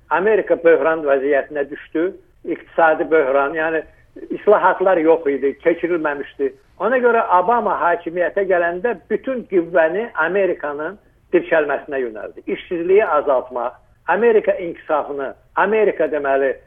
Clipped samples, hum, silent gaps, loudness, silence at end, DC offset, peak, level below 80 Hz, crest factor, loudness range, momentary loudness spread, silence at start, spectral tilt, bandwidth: under 0.1%; none; none; -18 LUFS; 0.1 s; under 0.1%; 0 dBFS; -54 dBFS; 16 dB; 3 LU; 11 LU; 0.1 s; -8.5 dB/octave; 3.7 kHz